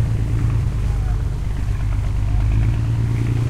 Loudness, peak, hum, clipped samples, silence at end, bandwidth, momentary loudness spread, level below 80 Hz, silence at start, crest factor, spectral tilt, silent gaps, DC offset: -21 LUFS; -6 dBFS; none; under 0.1%; 0 s; 10.5 kHz; 4 LU; -22 dBFS; 0 s; 12 dB; -7.5 dB/octave; none; under 0.1%